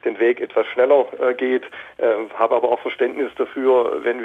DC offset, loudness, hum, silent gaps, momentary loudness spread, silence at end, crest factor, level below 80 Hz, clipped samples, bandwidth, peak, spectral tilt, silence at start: under 0.1%; -19 LUFS; none; none; 7 LU; 0 s; 14 dB; -68 dBFS; under 0.1%; 3.9 kHz; -4 dBFS; -6 dB/octave; 0.05 s